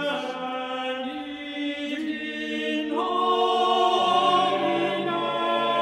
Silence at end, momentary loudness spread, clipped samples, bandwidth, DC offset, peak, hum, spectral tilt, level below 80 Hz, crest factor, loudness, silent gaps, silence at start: 0 s; 10 LU; under 0.1%; 12.5 kHz; under 0.1%; -10 dBFS; none; -4 dB/octave; -68 dBFS; 16 dB; -25 LUFS; none; 0 s